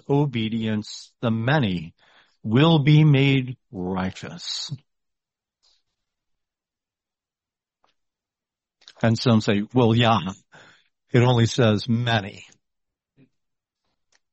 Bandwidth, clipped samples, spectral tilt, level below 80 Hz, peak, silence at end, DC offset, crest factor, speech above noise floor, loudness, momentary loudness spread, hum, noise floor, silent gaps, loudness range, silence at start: 8.2 kHz; under 0.1%; -6.5 dB/octave; -58 dBFS; -4 dBFS; 1.9 s; under 0.1%; 18 dB; over 69 dB; -21 LUFS; 17 LU; none; under -90 dBFS; none; 13 LU; 0.1 s